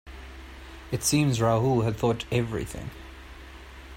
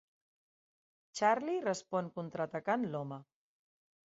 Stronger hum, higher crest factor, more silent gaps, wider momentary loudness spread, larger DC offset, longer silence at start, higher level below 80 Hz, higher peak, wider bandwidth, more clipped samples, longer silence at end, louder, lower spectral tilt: neither; about the same, 18 dB vs 22 dB; neither; first, 22 LU vs 13 LU; neither; second, 0.05 s vs 1.15 s; first, -46 dBFS vs -82 dBFS; first, -10 dBFS vs -16 dBFS; first, 16 kHz vs 7.6 kHz; neither; second, 0 s vs 0.8 s; first, -26 LUFS vs -36 LUFS; about the same, -5 dB/octave vs -4.5 dB/octave